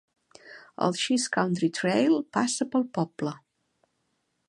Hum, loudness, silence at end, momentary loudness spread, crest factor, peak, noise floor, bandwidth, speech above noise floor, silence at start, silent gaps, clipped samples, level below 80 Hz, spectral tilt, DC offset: none; -27 LUFS; 1.1 s; 10 LU; 20 dB; -8 dBFS; -76 dBFS; 11.5 kHz; 50 dB; 0.45 s; none; under 0.1%; -74 dBFS; -4.5 dB/octave; under 0.1%